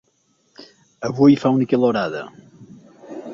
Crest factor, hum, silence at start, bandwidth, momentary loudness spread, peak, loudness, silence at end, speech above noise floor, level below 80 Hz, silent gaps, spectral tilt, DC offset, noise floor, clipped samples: 18 dB; none; 0.6 s; 7.2 kHz; 22 LU; -4 dBFS; -18 LUFS; 0 s; 47 dB; -60 dBFS; none; -7.5 dB/octave; under 0.1%; -64 dBFS; under 0.1%